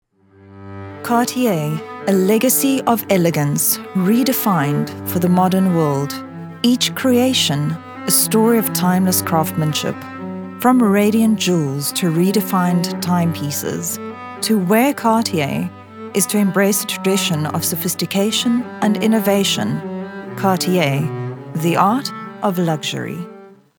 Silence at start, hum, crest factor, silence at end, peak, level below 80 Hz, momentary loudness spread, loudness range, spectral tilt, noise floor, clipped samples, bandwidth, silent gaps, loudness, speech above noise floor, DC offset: 0.45 s; none; 18 dB; 0.3 s; 0 dBFS; -68 dBFS; 12 LU; 3 LU; -4.5 dB/octave; -46 dBFS; under 0.1%; over 20 kHz; none; -17 LUFS; 30 dB; under 0.1%